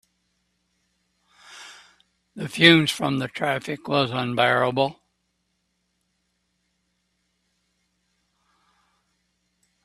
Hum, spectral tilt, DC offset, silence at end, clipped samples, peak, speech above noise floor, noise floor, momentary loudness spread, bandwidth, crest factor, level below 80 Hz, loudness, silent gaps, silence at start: none; -5 dB/octave; under 0.1%; 4.9 s; under 0.1%; 0 dBFS; 52 dB; -74 dBFS; 21 LU; 13.5 kHz; 26 dB; -66 dBFS; -21 LUFS; none; 1.5 s